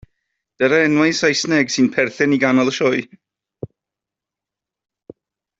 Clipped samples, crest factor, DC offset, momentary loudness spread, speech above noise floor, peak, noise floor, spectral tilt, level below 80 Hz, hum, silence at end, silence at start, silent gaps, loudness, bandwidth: under 0.1%; 18 dB; under 0.1%; 21 LU; 70 dB; -2 dBFS; -86 dBFS; -4.5 dB/octave; -60 dBFS; none; 2.55 s; 0.6 s; none; -16 LUFS; 7.8 kHz